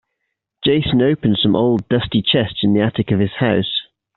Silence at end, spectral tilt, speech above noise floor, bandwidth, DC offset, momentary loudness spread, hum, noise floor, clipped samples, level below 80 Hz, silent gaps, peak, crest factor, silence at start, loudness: 0.35 s; -5 dB/octave; 60 dB; 4.3 kHz; under 0.1%; 4 LU; none; -76 dBFS; under 0.1%; -44 dBFS; none; -2 dBFS; 16 dB; 0.6 s; -17 LUFS